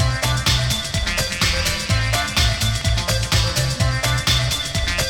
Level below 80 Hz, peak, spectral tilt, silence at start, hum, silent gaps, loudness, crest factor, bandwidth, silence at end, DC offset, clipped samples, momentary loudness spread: -26 dBFS; -4 dBFS; -3 dB/octave; 0 s; none; none; -19 LUFS; 16 dB; 19 kHz; 0 s; under 0.1%; under 0.1%; 3 LU